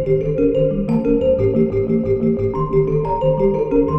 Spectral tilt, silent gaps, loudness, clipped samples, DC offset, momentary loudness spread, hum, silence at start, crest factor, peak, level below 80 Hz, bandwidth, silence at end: -11 dB/octave; none; -17 LUFS; under 0.1%; under 0.1%; 2 LU; none; 0 s; 12 dB; -4 dBFS; -32 dBFS; 5.6 kHz; 0 s